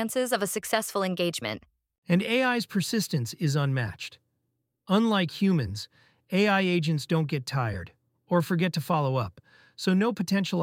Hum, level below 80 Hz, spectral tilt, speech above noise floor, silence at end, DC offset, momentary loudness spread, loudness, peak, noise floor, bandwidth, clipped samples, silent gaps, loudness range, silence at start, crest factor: none; -60 dBFS; -5.5 dB/octave; 52 dB; 0 s; under 0.1%; 11 LU; -27 LUFS; -8 dBFS; -79 dBFS; 17 kHz; under 0.1%; 1.98-2.03 s; 2 LU; 0 s; 18 dB